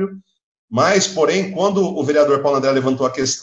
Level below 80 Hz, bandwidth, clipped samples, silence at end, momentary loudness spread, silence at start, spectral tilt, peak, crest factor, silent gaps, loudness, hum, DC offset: -60 dBFS; 8.6 kHz; under 0.1%; 0 s; 4 LU; 0 s; -4 dB/octave; -2 dBFS; 14 dB; 0.43-0.68 s; -17 LUFS; none; under 0.1%